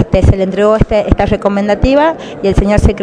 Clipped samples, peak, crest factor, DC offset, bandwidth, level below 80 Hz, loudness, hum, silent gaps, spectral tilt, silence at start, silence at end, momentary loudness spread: 2%; 0 dBFS; 10 dB; under 0.1%; 11 kHz; -18 dBFS; -11 LUFS; none; none; -7.5 dB/octave; 0 s; 0 s; 4 LU